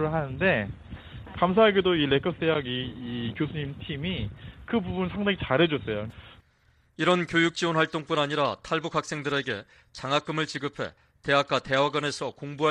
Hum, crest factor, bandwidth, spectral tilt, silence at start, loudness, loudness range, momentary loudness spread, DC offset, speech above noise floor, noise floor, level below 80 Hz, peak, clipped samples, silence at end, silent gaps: none; 20 dB; 11 kHz; -5.5 dB/octave; 0 s; -27 LUFS; 4 LU; 13 LU; under 0.1%; 37 dB; -64 dBFS; -52 dBFS; -8 dBFS; under 0.1%; 0 s; none